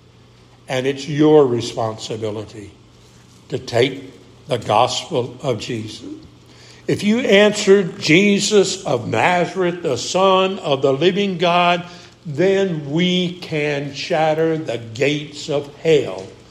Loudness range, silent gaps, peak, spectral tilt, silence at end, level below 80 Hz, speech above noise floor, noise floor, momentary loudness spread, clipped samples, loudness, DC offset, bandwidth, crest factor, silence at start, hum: 7 LU; none; 0 dBFS; -5 dB/octave; 0.15 s; -58 dBFS; 30 dB; -47 dBFS; 15 LU; under 0.1%; -18 LUFS; under 0.1%; 13 kHz; 18 dB; 0.7 s; none